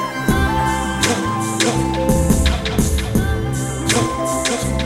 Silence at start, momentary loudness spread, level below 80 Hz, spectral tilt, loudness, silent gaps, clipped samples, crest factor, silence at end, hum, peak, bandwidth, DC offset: 0 s; 4 LU; -24 dBFS; -4.5 dB/octave; -18 LUFS; none; under 0.1%; 16 dB; 0 s; none; -2 dBFS; 16.5 kHz; under 0.1%